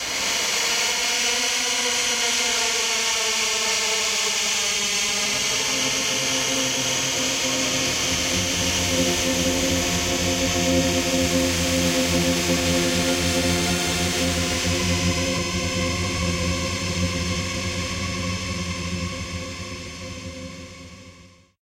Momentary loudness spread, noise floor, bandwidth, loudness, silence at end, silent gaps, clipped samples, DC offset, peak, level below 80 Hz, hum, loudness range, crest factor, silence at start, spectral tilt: 8 LU; -50 dBFS; 16 kHz; -21 LUFS; 0.35 s; none; under 0.1%; under 0.1%; -8 dBFS; -40 dBFS; none; 7 LU; 16 dB; 0 s; -2.5 dB/octave